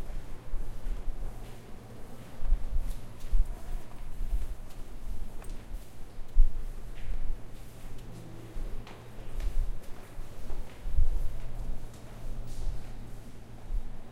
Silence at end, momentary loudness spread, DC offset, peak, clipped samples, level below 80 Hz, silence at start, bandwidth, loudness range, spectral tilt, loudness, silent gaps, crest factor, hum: 0 s; 13 LU; under 0.1%; -8 dBFS; under 0.1%; -32 dBFS; 0 s; 5 kHz; 3 LU; -6 dB/octave; -41 LUFS; none; 20 dB; none